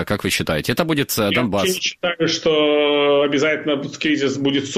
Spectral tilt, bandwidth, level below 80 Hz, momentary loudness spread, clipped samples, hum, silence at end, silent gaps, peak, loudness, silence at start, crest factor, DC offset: -4 dB/octave; 15 kHz; -50 dBFS; 5 LU; under 0.1%; none; 0 s; none; -4 dBFS; -18 LUFS; 0 s; 16 dB; under 0.1%